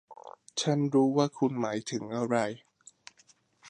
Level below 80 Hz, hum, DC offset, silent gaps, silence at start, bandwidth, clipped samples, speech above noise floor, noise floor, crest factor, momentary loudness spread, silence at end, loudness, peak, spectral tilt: -76 dBFS; none; under 0.1%; none; 0.1 s; 10 kHz; under 0.1%; 36 dB; -65 dBFS; 20 dB; 17 LU; 0 s; -29 LUFS; -12 dBFS; -5.5 dB/octave